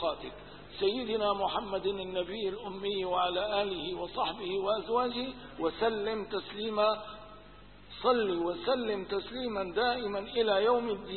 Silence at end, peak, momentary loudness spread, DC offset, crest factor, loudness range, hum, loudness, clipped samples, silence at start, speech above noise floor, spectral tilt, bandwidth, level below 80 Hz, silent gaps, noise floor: 0 s; -14 dBFS; 9 LU; 0.1%; 18 dB; 2 LU; 50 Hz at -60 dBFS; -32 LUFS; under 0.1%; 0 s; 22 dB; -8.5 dB/octave; 4.5 kHz; -58 dBFS; none; -54 dBFS